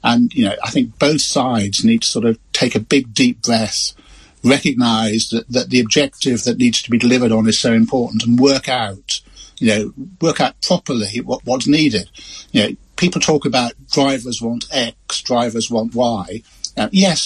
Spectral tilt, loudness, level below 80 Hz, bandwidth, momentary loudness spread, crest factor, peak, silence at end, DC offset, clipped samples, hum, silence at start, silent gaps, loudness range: -4 dB/octave; -16 LUFS; -48 dBFS; 12 kHz; 8 LU; 16 dB; 0 dBFS; 0 s; under 0.1%; under 0.1%; none; 0.05 s; none; 3 LU